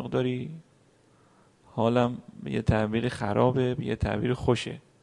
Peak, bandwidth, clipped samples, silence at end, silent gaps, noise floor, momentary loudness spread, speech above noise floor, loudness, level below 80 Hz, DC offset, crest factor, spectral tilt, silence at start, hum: -8 dBFS; 11 kHz; under 0.1%; 0.2 s; none; -61 dBFS; 13 LU; 35 dB; -27 LUFS; -48 dBFS; under 0.1%; 20 dB; -7 dB/octave; 0 s; none